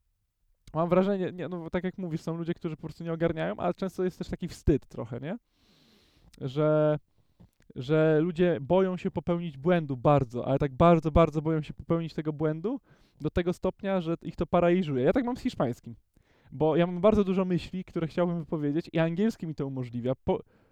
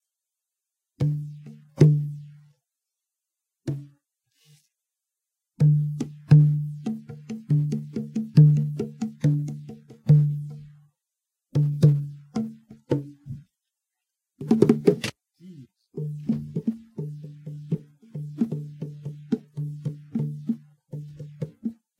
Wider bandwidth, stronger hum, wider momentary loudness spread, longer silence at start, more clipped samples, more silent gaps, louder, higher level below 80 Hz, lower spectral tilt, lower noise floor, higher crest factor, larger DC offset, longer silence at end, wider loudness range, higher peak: first, 9.6 kHz vs 7.2 kHz; neither; second, 12 LU vs 21 LU; second, 0.65 s vs 1 s; neither; neither; second, -28 LUFS vs -24 LUFS; first, -48 dBFS vs -62 dBFS; about the same, -8.5 dB/octave vs -9 dB/octave; second, -74 dBFS vs -87 dBFS; about the same, 20 dB vs 24 dB; neither; about the same, 0.3 s vs 0.25 s; second, 6 LU vs 10 LU; second, -10 dBFS vs -2 dBFS